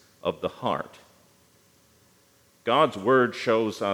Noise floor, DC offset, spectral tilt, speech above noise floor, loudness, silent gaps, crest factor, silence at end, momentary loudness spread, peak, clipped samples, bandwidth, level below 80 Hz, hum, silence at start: -61 dBFS; under 0.1%; -5.5 dB/octave; 37 dB; -25 LUFS; none; 18 dB; 0 s; 11 LU; -8 dBFS; under 0.1%; 16.5 kHz; -72 dBFS; none; 0.25 s